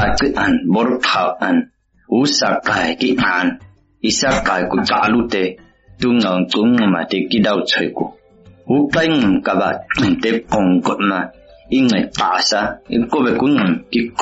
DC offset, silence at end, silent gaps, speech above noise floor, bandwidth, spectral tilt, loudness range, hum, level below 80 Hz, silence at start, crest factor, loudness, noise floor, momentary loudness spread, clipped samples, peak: under 0.1%; 0 s; none; 30 dB; 8 kHz; -3.5 dB/octave; 1 LU; none; -42 dBFS; 0 s; 12 dB; -16 LUFS; -46 dBFS; 6 LU; under 0.1%; -4 dBFS